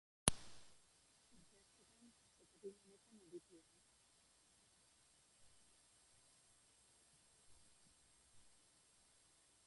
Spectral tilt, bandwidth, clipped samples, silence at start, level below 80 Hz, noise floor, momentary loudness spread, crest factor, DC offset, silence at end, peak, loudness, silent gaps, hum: -2.5 dB/octave; 11.5 kHz; under 0.1%; 0.25 s; -66 dBFS; -74 dBFS; 26 LU; 44 dB; under 0.1%; 1.2 s; -10 dBFS; -46 LUFS; none; none